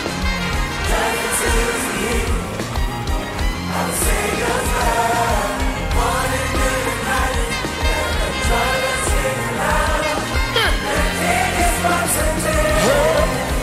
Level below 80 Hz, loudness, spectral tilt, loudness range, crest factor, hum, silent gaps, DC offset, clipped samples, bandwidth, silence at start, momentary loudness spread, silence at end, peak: -24 dBFS; -18 LUFS; -3.5 dB/octave; 3 LU; 14 dB; none; none; under 0.1%; under 0.1%; 16 kHz; 0 s; 5 LU; 0 s; -4 dBFS